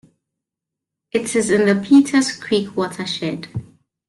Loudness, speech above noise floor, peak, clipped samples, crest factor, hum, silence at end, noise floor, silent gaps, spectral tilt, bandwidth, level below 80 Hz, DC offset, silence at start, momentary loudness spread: -18 LUFS; 67 dB; -2 dBFS; under 0.1%; 16 dB; none; 0.45 s; -84 dBFS; none; -4.5 dB/octave; 12 kHz; -58 dBFS; under 0.1%; 1.15 s; 14 LU